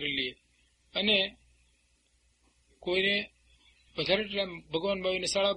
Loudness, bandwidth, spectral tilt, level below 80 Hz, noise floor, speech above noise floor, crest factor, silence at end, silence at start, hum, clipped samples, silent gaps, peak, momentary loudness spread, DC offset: -30 LUFS; 10.5 kHz; -3 dB/octave; -62 dBFS; -70 dBFS; 40 dB; 20 dB; 0 s; 0 s; 60 Hz at -65 dBFS; under 0.1%; none; -12 dBFS; 11 LU; under 0.1%